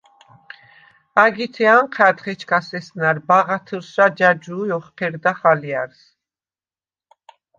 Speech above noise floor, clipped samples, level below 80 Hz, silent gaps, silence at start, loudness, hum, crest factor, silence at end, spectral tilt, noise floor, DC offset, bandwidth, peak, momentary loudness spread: over 72 dB; under 0.1%; -70 dBFS; none; 1.15 s; -18 LUFS; none; 18 dB; 1.75 s; -6 dB/octave; under -90 dBFS; under 0.1%; 7.4 kHz; -2 dBFS; 12 LU